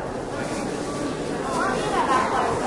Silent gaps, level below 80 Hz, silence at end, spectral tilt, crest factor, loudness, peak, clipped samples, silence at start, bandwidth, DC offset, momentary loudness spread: none; -46 dBFS; 0 s; -4.5 dB/octave; 14 dB; -25 LUFS; -10 dBFS; under 0.1%; 0 s; 11.5 kHz; under 0.1%; 7 LU